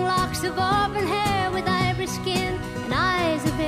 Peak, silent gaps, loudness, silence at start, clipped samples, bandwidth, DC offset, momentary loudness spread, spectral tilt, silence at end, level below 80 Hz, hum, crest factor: -10 dBFS; none; -23 LUFS; 0 s; under 0.1%; 15.5 kHz; under 0.1%; 5 LU; -4.5 dB/octave; 0 s; -42 dBFS; none; 14 dB